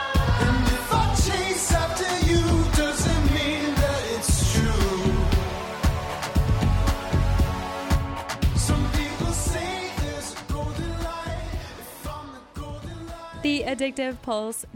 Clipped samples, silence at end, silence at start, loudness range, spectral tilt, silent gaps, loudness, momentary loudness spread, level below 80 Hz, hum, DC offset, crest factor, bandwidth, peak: under 0.1%; 0.05 s; 0 s; 9 LU; -5 dB/octave; none; -24 LUFS; 14 LU; -28 dBFS; none; under 0.1%; 14 dB; 17 kHz; -10 dBFS